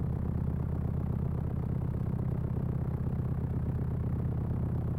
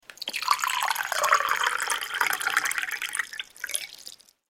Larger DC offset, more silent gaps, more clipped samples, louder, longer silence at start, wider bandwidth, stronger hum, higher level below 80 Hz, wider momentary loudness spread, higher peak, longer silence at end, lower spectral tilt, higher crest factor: first, 0.1% vs under 0.1%; neither; neither; second, -33 LUFS vs -26 LUFS; about the same, 0 s vs 0.1 s; second, 3.2 kHz vs 17 kHz; neither; first, -40 dBFS vs -70 dBFS; second, 1 LU vs 12 LU; second, -20 dBFS vs -4 dBFS; second, 0 s vs 0.35 s; first, -11 dB/octave vs 2 dB/octave; second, 12 dB vs 24 dB